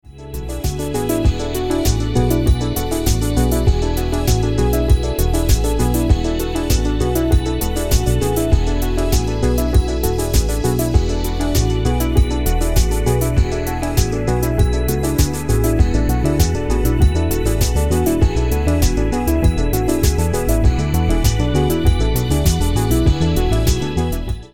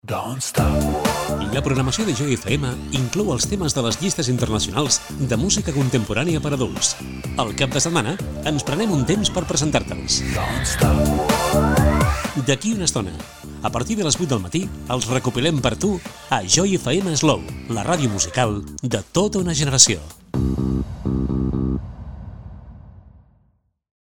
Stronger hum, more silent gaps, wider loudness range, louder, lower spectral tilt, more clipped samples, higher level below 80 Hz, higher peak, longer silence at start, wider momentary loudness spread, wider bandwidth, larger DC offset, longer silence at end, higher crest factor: neither; neither; about the same, 1 LU vs 3 LU; about the same, -18 LUFS vs -20 LUFS; first, -6 dB/octave vs -4 dB/octave; neither; first, -20 dBFS vs -32 dBFS; about the same, 0 dBFS vs 0 dBFS; about the same, 0 s vs 0.05 s; second, 4 LU vs 8 LU; about the same, 17.5 kHz vs 19 kHz; first, 3% vs 0.3%; second, 0 s vs 0.95 s; about the same, 16 dB vs 20 dB